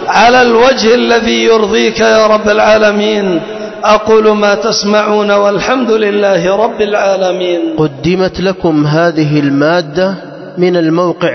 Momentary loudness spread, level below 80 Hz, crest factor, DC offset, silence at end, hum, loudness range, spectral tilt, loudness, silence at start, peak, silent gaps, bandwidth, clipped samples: 7 LU; -42 dBFS; 10 dB; under 0.1%; 0 s; none; 3 LU; -5 dB/octave; -9 LUFS; 0 s; 0 dBFS; none; 6.4 kHz; under 0.1%